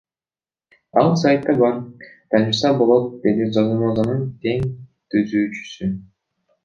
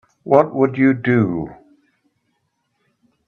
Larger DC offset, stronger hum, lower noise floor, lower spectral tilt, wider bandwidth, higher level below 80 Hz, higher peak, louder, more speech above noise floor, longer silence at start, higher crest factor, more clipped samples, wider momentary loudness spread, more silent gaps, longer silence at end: neither; neither; first, under -90 dBFS vs -70 dBFS; second, -7 dB/octave vs -10 dB/octave; first, 7.4 kHz vs 6.4 kHz; about the same, -52 dBFS vs -56 dBFS; about the same, -2 dBFS vs 0 dBFS; about the same, -19 LUFS vs -17 LUFS; first, over 72 dB vs 54 dB; first, 0.95 s vs 0.25 s; about the same, 18 dB vs 20 dB; neither; about the same, 11 LU vs 10 LU; neither; second, 0.65 s vs 1.75 s